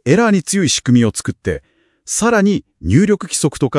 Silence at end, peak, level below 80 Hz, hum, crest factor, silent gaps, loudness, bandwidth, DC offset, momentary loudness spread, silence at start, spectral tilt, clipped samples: 0 s; 0 dBFS; -42 dBFS; none; 14 dB; none; -15 LUFS; 12 kHz; under 0.1%; 9 LU; 0.05 s; -5 dB/octave; under 0.1%